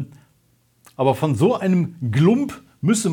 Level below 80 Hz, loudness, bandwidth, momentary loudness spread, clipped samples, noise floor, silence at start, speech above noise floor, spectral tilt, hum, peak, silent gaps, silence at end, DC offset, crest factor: -64 dBFS; -20 LUFS; 17.5 kHz; 8 LU; under 0.1%; -61 dBFS; 0 s; 43 dB; -6.5 dB/octave; none; -4 dBFS; none; 0 s; under 0.1%; 18 dB